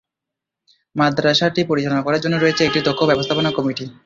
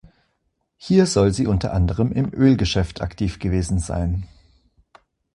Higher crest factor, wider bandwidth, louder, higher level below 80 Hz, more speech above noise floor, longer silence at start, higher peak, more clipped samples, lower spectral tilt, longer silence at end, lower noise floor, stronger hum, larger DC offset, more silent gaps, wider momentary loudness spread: about the same, 16 dB vs 18 dB; second, 7.6 kHz vs 11.5 kHz; about the same, -18 LUFS vs -20 LUFS; second, -54 dBFS vs -32 dBFS; first, 66 dB vs 52 dB; first, 0.95 s vs 0.8 s; about the same, -2 dBFS vs -2 dBFS; neither; about the same, -5.5 dB/octave vs -6.5 dB/octave; second, 0.15 s vs 1.1 s; first, -84 dBFS vs -72 dBFS; neither; neither; neither; second, 4 LU vs 9 LU